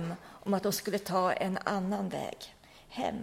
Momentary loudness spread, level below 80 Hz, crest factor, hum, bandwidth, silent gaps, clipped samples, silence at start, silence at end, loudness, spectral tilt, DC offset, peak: 12 LU; -64 dBFS; 20 dB; none; 16.5 kHz; none; under 0.1%; 0 s; 0 s; -33 LUFS; -5 dB/octave; under 0.1%; -14 dBFS